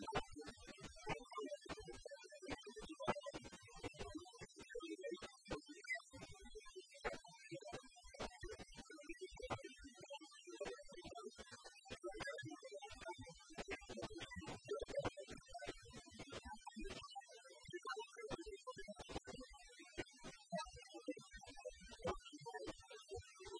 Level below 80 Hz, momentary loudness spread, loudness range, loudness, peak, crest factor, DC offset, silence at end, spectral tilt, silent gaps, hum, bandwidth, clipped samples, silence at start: -66 dBFS; 10 LU; 3 LU; -53 LUFS; -26 dBFS; 26 dB; under 0.1%; 0 s; -4 dB/octave; none; none; 10.5 kHz; under 0.1%; 0 s